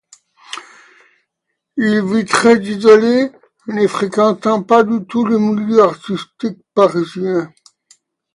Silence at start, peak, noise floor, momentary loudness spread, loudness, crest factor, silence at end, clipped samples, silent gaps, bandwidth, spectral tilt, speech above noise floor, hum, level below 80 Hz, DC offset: 0.5 s; 0 dBFS; -75 dBFS; 16 LU; -14 LUFS; 16 dB; 0.85 s; under 0.1%; none; 11.5 kHz; -5.5 dB/octave; 62 dB; none; -60 dBFS; under 0.1%